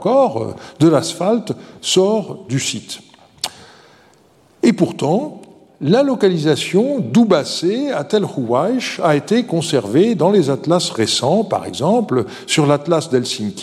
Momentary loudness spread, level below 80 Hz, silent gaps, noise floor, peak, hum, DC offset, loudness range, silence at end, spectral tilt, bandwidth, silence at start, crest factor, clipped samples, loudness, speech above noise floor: 10 LU; -62 dBFS; none; -51 dBFS; 0 dBFS; none; under 0.1%; 5 LU; 0 s; -5 dB/octave; 14 kHz; 0 s; 16 dB; under 0.1%; -16 LUFS; 35 dB